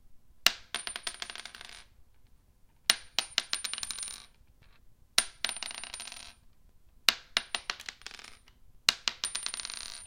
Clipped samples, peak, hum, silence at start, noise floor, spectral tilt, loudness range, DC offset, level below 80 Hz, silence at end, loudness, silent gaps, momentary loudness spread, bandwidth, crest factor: under 0.1%; 0 dBFS; none; 0.05 s; -62 dBFS; 1.5 dB/octave; 3 LU; under 0.1%; -62 dBFS; 0 s; -32 LUFS; none; 18 LU; 17 kHz; 36 dB